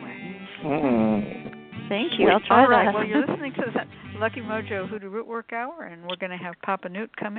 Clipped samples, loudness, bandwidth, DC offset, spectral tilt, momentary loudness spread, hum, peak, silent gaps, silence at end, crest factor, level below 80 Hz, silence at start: under 0.1%; -24 LUFS; 4.5 kHz; under 0.1%; -10 dB/octave; 19 LU; none; -4 dBFS; none; 0 s; 20 dB; -62 dBFS; 0 s